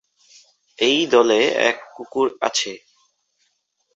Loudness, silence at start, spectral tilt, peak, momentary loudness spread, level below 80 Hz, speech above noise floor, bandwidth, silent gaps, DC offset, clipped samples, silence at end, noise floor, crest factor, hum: -19 LUFS; 0.8 s; -2 dB/octave; -2 dBFS; 14 LU; -68 dBFS; 51 dB; 8.2 kHz; none; under 0.1%; under 0.1%; 1.2 s; -69 dBFS; 20 dB; none